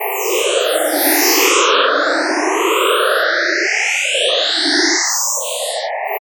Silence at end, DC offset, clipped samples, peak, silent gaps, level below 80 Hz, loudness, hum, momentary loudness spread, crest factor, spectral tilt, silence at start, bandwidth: 0.15 s; under 0.1%; under 0.1%; 0 dBFS; none; -88 dBFS; -14 LUFS; none; 7 LU; 16 dB; 2.5 dB/octave; 0 s; over 20 kHz